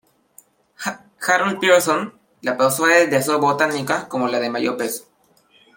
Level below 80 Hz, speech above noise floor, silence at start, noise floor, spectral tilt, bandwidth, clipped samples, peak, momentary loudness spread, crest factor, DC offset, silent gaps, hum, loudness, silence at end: -68 dBFS; 39 dB; 0.8 s; -57 dBFS; -3.5 dB/octave; 17 kHz; under 0.1%; -2 dBFS; 14 LU; 18 dB; under 0.1%; none; none; -19 LUFS; 0.75 s